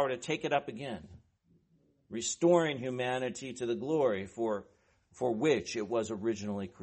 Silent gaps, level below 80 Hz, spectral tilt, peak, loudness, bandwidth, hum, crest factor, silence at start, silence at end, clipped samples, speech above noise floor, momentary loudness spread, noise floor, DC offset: none; -70 dBFS; -4.5 dB/octave; -14 dBFS; -33 LUFS; 8.4 kHz; none; 20 dB; 0 s; 0 s; under 0.1%; 38 dB; 12 LU; -70 dBFS; under 0.1%